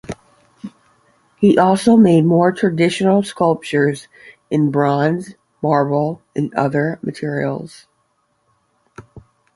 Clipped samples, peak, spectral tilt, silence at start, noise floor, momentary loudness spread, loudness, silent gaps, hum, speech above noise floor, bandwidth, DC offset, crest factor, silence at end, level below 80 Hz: under 0.1%; -2 dBFS; -7 dB/octave; 0.1 s; -65 dBFS; 22 LU; -16 LUFS; none; none; 49 dB; 11.5 kHz; under 0.1%; 16 dB; 0.35 s; -56 dBFS